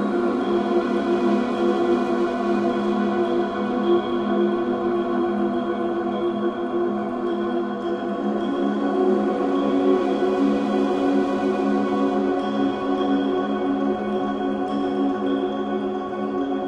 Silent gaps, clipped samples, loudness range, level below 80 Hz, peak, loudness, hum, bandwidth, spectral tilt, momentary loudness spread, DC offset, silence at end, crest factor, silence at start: none; under 0.1%; 3 LU; -56 dBFS; -8 dBFS; -22 LUFS; none; 8.6 kHz; -7.5 dB/octave; 4 LU; under 0.1%; 0 s; 14 dB; 0 s